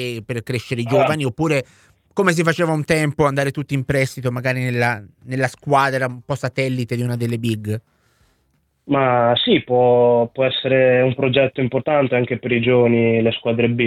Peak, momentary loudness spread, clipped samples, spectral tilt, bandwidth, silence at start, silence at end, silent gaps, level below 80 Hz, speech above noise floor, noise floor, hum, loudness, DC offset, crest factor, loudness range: 0 dBFS; 9 LU; under 0.1%; -6 dB/octave; 15.5 kHz; 0 s; 0 s; none; -52 dBFS; 47 dB; -65 dBFS; none; -18 LUFS; under 0.1%; 18 dB; 5 LU